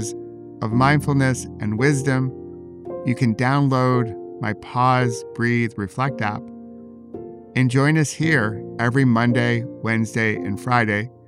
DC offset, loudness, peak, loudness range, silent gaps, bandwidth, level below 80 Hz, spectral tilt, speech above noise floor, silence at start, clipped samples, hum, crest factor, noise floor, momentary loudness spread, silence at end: under 0.1%; -20 LUFS; -4 dBFS; 3 LU; none; 13 kHz; -56 dBFS; -6.5 dB/octave; 20 dB; 0 s; under 0.1%; none; 18 dB; -40 dBFS; 19 LU; 0.15 s